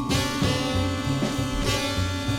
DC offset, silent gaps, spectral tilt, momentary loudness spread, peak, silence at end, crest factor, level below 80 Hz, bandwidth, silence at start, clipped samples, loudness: under 0.1%; none; -4.5 dB/octave; 3 LU; -10 dBFS; 0 s; 14 dB; -36 dBFS; 17 kHz; 0 s; under 0.1%; -25 LUFS